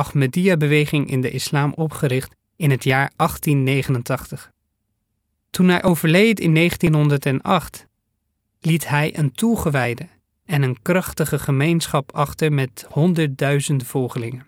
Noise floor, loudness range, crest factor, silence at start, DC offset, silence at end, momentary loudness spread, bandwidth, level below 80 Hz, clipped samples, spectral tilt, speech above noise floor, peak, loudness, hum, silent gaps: -73 dBFS; 4 LU; 16 dB; 0 s; under 0.1%; 0.05 s; 9 LU; 17 kHz; -48 dBFS; under 0.1%; -6 dB/octave; 54 dB; -4 dBFS; -19 LUFS; none; none